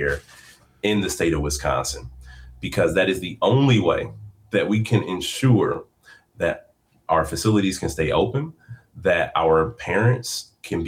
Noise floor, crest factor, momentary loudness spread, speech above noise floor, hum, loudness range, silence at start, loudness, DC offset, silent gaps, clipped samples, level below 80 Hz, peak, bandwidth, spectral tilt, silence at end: -52 dBFS; 14 dB; 12 LU; 31 dB; none; 3 LU; 0 s; -22 LUFS; under 0.1%; none; under 0.1%; -42 dBFS; -8 dBFS; 16.5 kHz; -5.5 dB/octave; 0 s